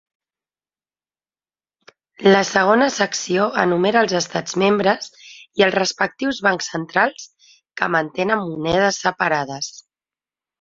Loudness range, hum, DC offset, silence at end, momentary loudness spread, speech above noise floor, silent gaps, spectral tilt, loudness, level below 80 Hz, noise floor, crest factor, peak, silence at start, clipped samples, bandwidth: 3 LU; none; under 0.1%; 0.85 s; 9 LU; over 72 dB; none; -4 dB/octave; -18 LUFS; -58 dBFS; under -90 dBFS; 20 dB; 0 dBFS; 2.2 s; under 0.1%; 7.8 kHz